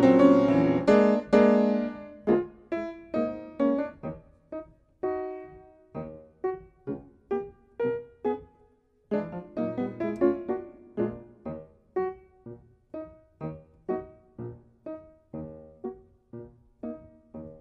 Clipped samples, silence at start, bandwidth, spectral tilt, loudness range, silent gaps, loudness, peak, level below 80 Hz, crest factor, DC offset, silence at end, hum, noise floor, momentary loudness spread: under 0.1%; 0 s; 8 kHz; -8.5 dB/octave; 16 LU; none; -27 LUFS; -6 dBFS; -60 dBFS; 22 dB; under 0.1%; 0.05 s; none; -63 dBFS; 23 LU